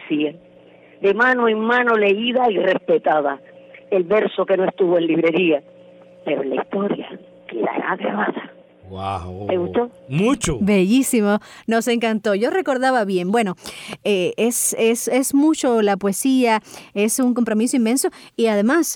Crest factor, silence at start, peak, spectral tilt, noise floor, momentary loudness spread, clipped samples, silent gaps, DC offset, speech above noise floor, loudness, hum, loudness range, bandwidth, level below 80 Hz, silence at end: 12 dB; 0 s; -6 dBFS; -4.5 dB/octave; -47 dBFS; 9 LU; under 0.1%; none; under 0.1%; 29 dB; -19 LUFS; none; 6 LU; 19.5 kHz; -50 dBFS; 0 s